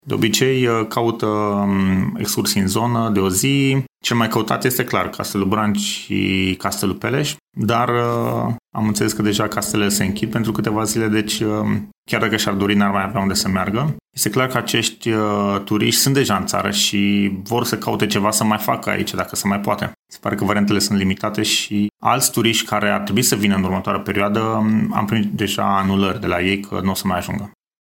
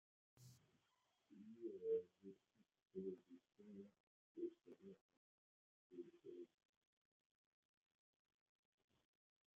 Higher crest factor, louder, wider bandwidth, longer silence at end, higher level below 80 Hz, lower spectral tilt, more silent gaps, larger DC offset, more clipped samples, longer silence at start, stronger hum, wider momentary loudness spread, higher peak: second, 16 dB vs 22 dB; first, -18 LUFS vs -54 LUFS; first, 17 kHz vs 7.2 kHz; second, 0.3 s vs 3.1 s; first, -52 dBFS vs under -90 dBFS; second, -4 dB/octave vs -8.5 dB/octave; second, 7.42-7.46 s, 11.97-12.03 s, 19.99-20.05 s vs 2.82-2.86 s, 4.00-4.35 s, 5.01-5.09 s, 5.17-5.90 s; neither; neither; second, 0.05 s vs 0.35 s; neither; second, 5 LU vs 20 LU; first, -2 dBFS vs -36 dBFS